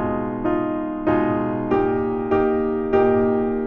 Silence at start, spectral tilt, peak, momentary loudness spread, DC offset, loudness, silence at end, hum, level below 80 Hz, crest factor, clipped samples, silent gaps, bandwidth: 0 s; -7 dB/octave; -6 dBFS; 6 LU; under 0.1%; -21 LUFS; 0 s; none; -42 dBFS; 14 dB; under 0.1%; none; 4.3 kHz